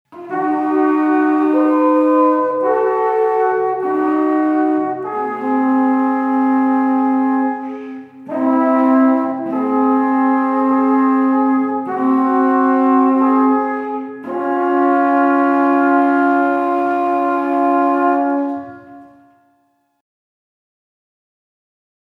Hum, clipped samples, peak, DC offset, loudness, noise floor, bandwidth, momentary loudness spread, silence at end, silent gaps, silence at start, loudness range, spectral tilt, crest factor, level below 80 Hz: none; under 0.1%; -2 dBFS; under 0.1%; -15 LUFS; -62 dBFS; 4.1 kHz; 8 LU; 2.95 s; none; 0.1 s; 3 LU; -7.5 dB/octave; 14 dB; -74 dBFS